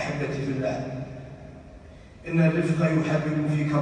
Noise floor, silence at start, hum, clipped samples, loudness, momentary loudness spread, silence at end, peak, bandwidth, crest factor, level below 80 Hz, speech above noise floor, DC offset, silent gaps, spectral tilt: -46 dBFS; 0 s; none; under 0.1%; -25 LUFS; 20 LU; 0 s; -10 dBFS; 9.8 kHz; 16 dB; -52 dBFS; 22 dB; under 0.1%; none; -8 dB/octave